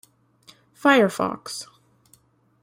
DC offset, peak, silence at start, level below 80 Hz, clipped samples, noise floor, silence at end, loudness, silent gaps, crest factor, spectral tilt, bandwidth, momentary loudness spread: under 0.1%; -4 dBFS; 0.85 s; -68 dBFS; under 0.1%; -60 dBFS; 1 s; -21 LUFS; none; 22 dB; -4.5 dB/octave; 16.5 kHz; 18 LU